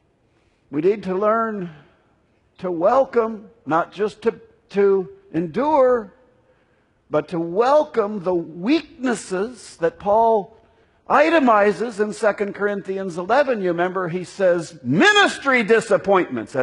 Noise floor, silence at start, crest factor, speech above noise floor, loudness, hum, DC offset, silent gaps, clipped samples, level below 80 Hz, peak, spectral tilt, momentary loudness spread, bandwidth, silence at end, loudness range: -61 dBFS; 0.7 s; 20 dB; 42 dB; -20 LUFS; none; under 0.1%; none; under 0.1%; -60 dBFS; 0 dBFS; -5 dB/octave; 11 LU; 11 kHz; 0 s; 4 LU